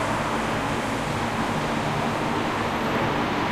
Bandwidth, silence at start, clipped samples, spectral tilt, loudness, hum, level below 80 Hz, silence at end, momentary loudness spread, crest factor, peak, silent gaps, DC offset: 15.5 kHz; 0 s; under 0.1%; -5 dB/octave; -25 LUFS; none; -44 dBFS; 0 s; 2 LU; 14 dB; -12 dBFS; none; under 0.1%